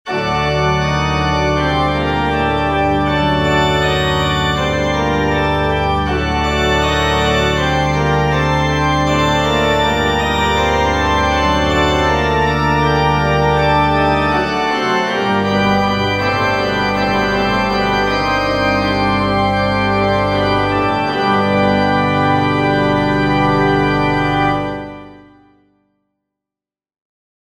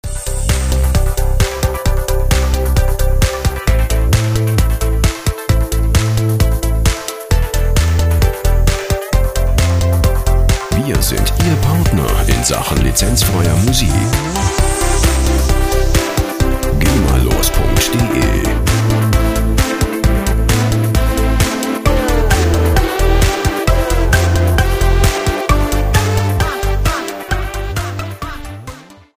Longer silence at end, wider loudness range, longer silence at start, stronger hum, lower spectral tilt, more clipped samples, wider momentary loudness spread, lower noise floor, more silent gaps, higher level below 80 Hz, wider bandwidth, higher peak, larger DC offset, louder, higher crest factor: first, 2.3 s vs 0.25 s; about the same, 1 LU vs 2 LU; about the same, 0.05 s vs 0.05 s; first, 50 Hz at -40 dBFS vs none; about the same, -5.5 dB/octave vs -5 dB/octave; neither; second, 2 LU vs 5 LU; first, -89 dBFS vs -33 dBFS; neither; second, -28 dBFS vs -16 dBFS; about the same, 16 kHz vs 16 kHz; about the same, -2 dBFS vs 0 dBFS; neither; about the same, -15 LUFS vs -15 LUFS; about the same, 14 dB vs 12 dB